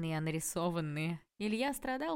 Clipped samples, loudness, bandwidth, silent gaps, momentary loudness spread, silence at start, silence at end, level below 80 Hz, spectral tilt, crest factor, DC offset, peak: under 0.1%; -36 LUFS; 16.5 kHz; none; 4 LU; 0 s; 0 s; -62 dBFS; -5 dB/octave; 14 dB; under 0.1%; -22 dBFS